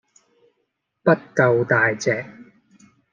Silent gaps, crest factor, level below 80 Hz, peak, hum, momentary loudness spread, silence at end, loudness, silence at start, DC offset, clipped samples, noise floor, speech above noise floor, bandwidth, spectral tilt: none; 20 dB; -66 dBFS; -2 dBFS; none; 8 LU; 0.7 s; -20 LUFS; 1.05 s; under 0.1%; under 0.1%; -74 dBFS; 55 dB; 9.4 kHz; -6 dB/octave